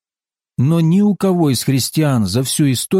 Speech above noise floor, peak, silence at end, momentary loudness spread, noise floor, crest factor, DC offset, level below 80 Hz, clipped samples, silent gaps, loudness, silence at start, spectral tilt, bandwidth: over 76 dB; -4 dBFS; 0 s; 3 LU; under -90 dBFS; 10 dB; under 0.1%; -52 dBFS; under 0.1%; none; -15 LUFS; 0.6 s; -5.5 dB/octave; 16.5 kHz